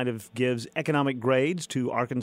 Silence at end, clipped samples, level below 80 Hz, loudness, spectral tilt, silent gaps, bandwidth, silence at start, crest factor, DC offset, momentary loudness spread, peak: 0 s; under 0.1%; -70 dBFS; -27 LUFS; -6 dB/octave; none; 16 kHz; 0 s; 16 dB; under 0.1%; 5 LU; -12 dBFS